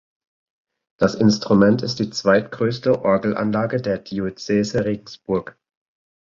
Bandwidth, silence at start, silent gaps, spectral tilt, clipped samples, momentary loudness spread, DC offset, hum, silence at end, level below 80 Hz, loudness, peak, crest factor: 7.6 kHz; 1 s; none; -6 dB/octave; under 0.1%; 9 LU; under 0.1%; none; 0.7 s; -52 dBFS; -20 LUFS; -2 dBFS; 18 dB